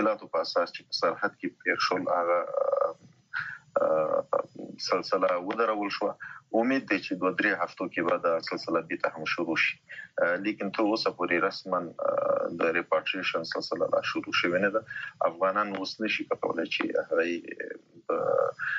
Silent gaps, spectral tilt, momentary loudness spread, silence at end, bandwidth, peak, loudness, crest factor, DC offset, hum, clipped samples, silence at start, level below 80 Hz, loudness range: none; -2 dB/octave; 6 LU; 0 s; 7.6 kHz; -10 dBFS; -29 LUFS; 18 dB; under 0.1%; none; under 0.1%; 0 s; -76 dBFS; 1 LU